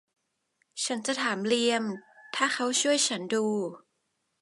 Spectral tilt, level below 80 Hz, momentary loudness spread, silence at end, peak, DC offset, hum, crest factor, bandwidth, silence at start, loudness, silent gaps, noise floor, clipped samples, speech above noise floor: -2 dB/octave; -80 dBFS; 12 LU; 0.65 s; -8 dBFS; under 0.1%; none; 22 dB; 11.5 kHz; 0.75 s; -28 LUFS; none; -78 dBFS; under 0.1%; 50 dB